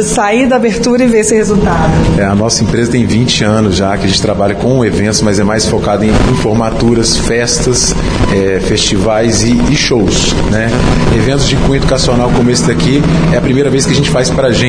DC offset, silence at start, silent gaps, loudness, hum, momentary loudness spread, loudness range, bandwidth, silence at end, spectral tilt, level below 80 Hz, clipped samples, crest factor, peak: under 0.1%; 0 s; none; -10 LUFS; none; 2 LU; 1 LU; 10.5 kHz; 0 s; -4.5 dB/octave; -20 dBFS; under 0.1%; 8 dB; 0 dBFS